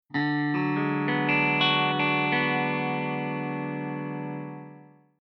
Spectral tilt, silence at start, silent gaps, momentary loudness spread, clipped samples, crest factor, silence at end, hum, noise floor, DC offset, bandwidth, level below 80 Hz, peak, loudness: -3 dB/octave; 0.1 s; none; 12 LU; under 0.1%; 18 dB; 0.35 s; none; -51 dBFS; under 0.1%; 6 kHz; -80 dBFS; -10 dBFS; -26 LUFS